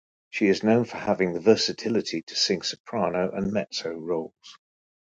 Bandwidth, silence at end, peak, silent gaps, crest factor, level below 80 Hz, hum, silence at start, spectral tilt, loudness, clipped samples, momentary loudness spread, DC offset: 9.2 kHz; 0.55 s; -4 dBFS; 2.23-2.27 s, 2.80-2.84 s; 22 dB; -60 dBFS; none; 0.35 s; -4.5 dB/octave; -25 LUFS; under 0.1%; 10 LU; under 0.1%